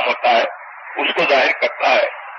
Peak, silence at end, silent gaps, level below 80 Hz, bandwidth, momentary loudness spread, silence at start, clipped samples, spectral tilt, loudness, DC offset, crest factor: -2 dBFS; 0 s; none; -66 dBFS; 7.2 kHz; 11 LU; 0 s; under 0.1%; -2.5 dB/octave; -16 LUFS; under 0.1%; 16 dB